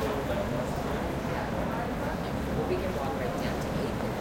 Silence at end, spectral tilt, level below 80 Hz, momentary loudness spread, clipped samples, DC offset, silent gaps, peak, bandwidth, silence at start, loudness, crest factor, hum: 0 s; -6.5 dB/octave; -42 dBFS; 2 LU; under 0.1%; under 0.1%; none; -16 dBFS; 16.5 kHz; 0 s; -31 LUFS; 14 dB; none